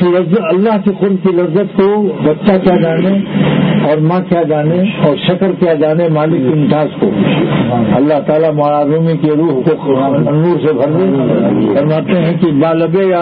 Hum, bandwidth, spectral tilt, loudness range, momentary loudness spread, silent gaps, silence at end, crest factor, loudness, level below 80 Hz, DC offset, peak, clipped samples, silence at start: none; 4.7 kHz; -12 dB/octave; 0 LU; 2 LU; none; 0 s; 10 dB; -11 LUFS; -48 dBFS; under 0.1%; 0 dBFS; under 0.1%; 0 s